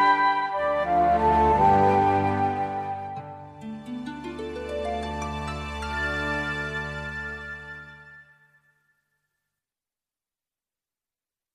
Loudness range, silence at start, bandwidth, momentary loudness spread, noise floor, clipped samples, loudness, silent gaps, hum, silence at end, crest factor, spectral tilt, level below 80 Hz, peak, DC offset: 15 LU; 0 s; 12 kHz; 19 LU; under -90 dBFS; under 0.1%; -25 LUFS; none; none; 3.35 s; 18 dB; -6 dB/octave; -44 dBFS; -10 dBFS; under 0.1%